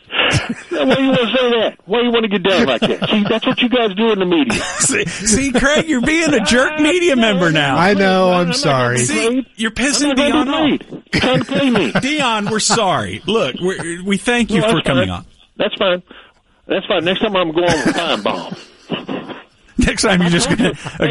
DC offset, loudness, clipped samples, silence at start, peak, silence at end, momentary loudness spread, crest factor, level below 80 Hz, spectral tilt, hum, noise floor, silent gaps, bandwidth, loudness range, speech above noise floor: under 0.1%; -15 LUFS; under 0.1%; 0.1 s; -2 dBFS; 0 s; 9 LU; 14 dB; -38 dBFS; -4 dB/octave; none; -35 dBFS; none; 11.5 kHz; 5 LU; 20 dB